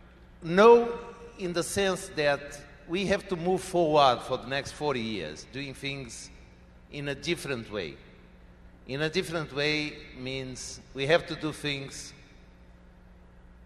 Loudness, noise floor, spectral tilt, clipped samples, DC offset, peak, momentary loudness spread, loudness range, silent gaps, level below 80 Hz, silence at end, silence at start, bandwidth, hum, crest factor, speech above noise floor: -28 LUFS; -53 dBFS; -4.5 dB/octave; under 0.1%; under 0.1%; -6 dBFS; 18 LU; 10 LU; none; -54 dBFS; 0 s; 0.2 s; 13 kHz; none; 24 dB; 25 dB